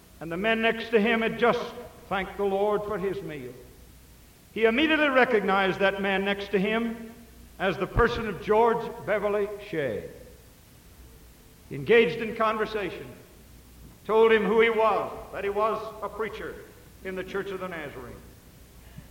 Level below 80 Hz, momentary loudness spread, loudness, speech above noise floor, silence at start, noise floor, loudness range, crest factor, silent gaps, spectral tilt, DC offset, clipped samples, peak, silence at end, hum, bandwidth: -48 dBFS; 18 LU; -26 LUFS; 27 dB; 0.2 s; -53 dBFS; 7 LU; 20 dB; none; -6 dB/octave; under 0.1%; under 0.1%; -8 dBFS; 0.05 s; none; 17 kHz